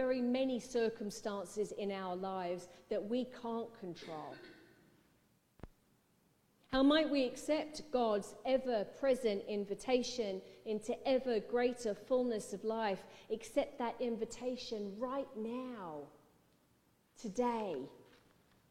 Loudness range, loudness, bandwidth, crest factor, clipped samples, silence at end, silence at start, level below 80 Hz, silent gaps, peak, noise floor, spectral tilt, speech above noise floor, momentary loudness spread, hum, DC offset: 9 LU; -38 LUFS; 15 kHz; 20 dB; under 0.1%; 0.65 s; 0 s; -68 dBFS; none; -20 dBFS; -74 dBFS; -4.5 dB/octave; 36 dB; 11 LU; none; under 0.1%